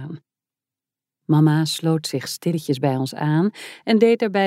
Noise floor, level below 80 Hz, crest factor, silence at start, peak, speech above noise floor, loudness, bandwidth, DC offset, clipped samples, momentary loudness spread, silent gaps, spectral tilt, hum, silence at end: -89 dBFS; -74 dBFS; 16 dB; 0 s; -4 dBFS; 70 dB; -20 LUFS; 15.5 kHz; under 0.1%; under 0.1%; 13 LU; none; -6 dB/octave; none; 0 s